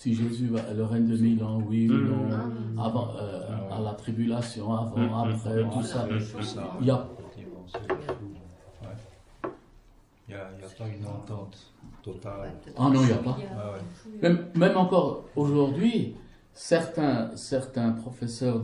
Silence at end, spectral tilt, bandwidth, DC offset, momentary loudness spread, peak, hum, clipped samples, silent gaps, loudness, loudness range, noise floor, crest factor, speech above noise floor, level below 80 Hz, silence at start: 0 s; -7.5 dB/octave; 11.5 kHz; under 0.1%; 18 LU; -8 dBFS; none; under 0.1%; none; -28 LUFS; 15 LU; -57 dBFS; 20 dB; 30 dB; -56 dBFS; 0 s